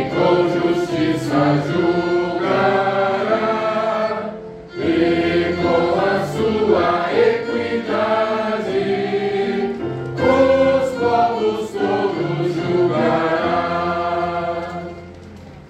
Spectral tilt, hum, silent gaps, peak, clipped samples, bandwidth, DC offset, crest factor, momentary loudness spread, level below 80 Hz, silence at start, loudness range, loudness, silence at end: -6.5 dB/octave; none; none; -4 dBFS; under 0.1%; 9.4 kHz; under 0.1%; 14 dB; 8 LU; -50 dBFS; 0 s; 2 LU; -18 LUFS; 0 s